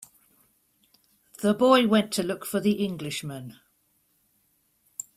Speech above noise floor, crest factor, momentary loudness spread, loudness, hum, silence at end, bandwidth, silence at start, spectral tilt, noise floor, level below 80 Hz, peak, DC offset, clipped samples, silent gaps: 45 dB; 22 dB; 21 LU; -24 LUFS; none; 1.65 s; 16 kHz; 1.4 s; -5 dB/octave; -69 dBFS; -68 dBFS; -6 dBFS; under 0.1%; under 0.1%; none